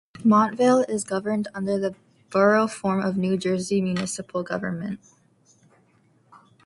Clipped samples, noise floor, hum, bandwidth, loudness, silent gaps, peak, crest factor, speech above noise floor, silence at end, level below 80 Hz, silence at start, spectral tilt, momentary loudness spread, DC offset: under 0.1%; -61 dBFS; none; 11.5 kHz; -23 LUFS; none; -6 dBFS; 18 dB; 39 dB; 1.7 s; -64 dBFS; 0.15 s; -6 dB/octave; 11 LU; under 0.1%